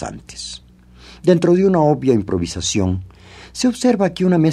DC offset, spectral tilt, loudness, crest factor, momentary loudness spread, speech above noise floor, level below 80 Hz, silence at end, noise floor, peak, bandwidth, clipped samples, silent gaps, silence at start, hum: under 0.1%; -6 dB/octave; -17 LUFS; 16 dB; 16 LU; 27 dB; -44 dBFS; 0 s; -43 dBFS; 0 dBFS; 12.5 kHz; under 0.1%; none; 0 s; 60 Hz at -45 dBFS